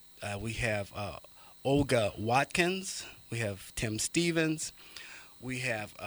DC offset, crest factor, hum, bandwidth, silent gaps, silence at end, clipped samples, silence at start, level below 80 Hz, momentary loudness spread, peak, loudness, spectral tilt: under 0.1%; 24 dB; none; over 20 kHz; none; 0 s; under 0.1%; 0.05 s; -54 dBFS; 17 LU; -10 dBFS; -32 LUFS; -4 dB/octave